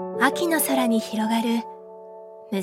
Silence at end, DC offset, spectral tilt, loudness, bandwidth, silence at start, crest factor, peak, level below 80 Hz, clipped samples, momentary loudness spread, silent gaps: 0 s; under 0.1%; -3.5 dB/octave; -23 LUFS; 17 kHz; 0 s; 20 dB; -4 dBFS; -74 dBFS; under 0.1%; 21 LU; none